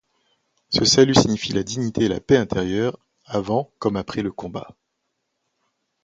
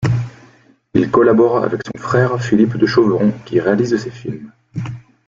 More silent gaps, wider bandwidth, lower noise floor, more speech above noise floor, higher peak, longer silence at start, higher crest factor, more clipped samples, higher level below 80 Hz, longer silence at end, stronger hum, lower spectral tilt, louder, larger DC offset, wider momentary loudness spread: neither; first, 9.4 kHz vs 7.6 kHz; first, -76 dBFS vs -49 dBFS; first, 55 dB vs 34 dB; about the same, 0 dBFS vs 0 dBFS; first, 0.7 s vs 0 s; first, 22 dB vs 16 dB; neither; about the same, -48 dBFS vs -48 dBFS; first, 1.4 s vs 0.3 s; neither; second, -4.5 dB/octave vs -7.5 dB/octave; second, -20 LUFS vs -15 LUFS; neither; about the same, 14 LU vs 16 LU